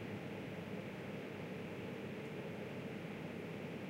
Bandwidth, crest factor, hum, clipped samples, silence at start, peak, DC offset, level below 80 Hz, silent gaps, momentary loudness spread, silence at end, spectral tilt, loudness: 16 kHz; 12 dB; none; under 0.1%; 0 s; -34 dBFS; under 0.1%; -74 dBFS; none; 1 LU; 0 s; -6.5 dB/octave; -47 LUFS